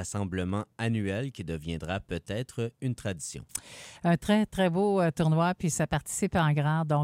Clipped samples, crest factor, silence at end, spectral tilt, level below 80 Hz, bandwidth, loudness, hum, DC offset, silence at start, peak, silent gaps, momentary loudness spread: under 0.1%; 18 dB; 0 s; -6 dB/octave; -52 dBFS; 16 kHz; -29 LUFS; none; under 0.1%; 0 s; -10 dBFS; none; 10 LU